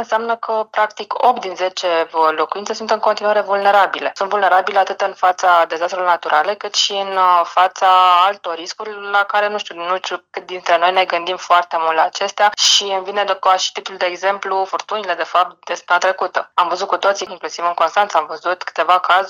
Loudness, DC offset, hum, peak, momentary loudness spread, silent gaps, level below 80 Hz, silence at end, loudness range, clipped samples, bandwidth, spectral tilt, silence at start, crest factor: -16 LUFS; under 0.1%; none; 0 dBFS; 9 LU; none; -74 dBFS; 0 s; 3 LU; under 0.1%; 16.5 kHz; -0.5 dB/octave; 0 s; 16 dB